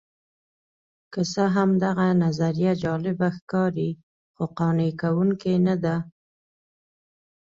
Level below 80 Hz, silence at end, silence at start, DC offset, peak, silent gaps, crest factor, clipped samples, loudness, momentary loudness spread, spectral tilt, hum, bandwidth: -60 dBFS; 1.45 s; 1.1 s; under 0.1%; -10 dBFS; 3.42-3.47 s, 4.03-4.34 s; 16 dB; under 0.1%; -24 LUFS; 9 LU; -7.5 dB/octave; none; 7.6 kHz